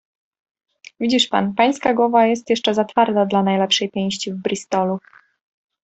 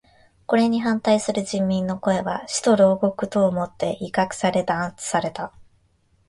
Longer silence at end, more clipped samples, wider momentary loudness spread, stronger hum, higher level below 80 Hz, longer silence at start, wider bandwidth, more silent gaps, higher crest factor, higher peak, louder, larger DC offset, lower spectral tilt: first, 0.85 s vs 0.65 s; neither; about the same, 8 LU vs 8 LU; neither; second, -62 dBFS vs -56 dBFS; first, 1 s vs 0.5 s; second, 8.4 kHz vs 11.5 kHz; neither; about the same, 18 dB vs 16 dB; first, -2 dBFS vs -6 dBFS; first, -18 LUFS vs -22 LUFS; neither; about the same, -4.5 dB/octave vs -5 dB/octave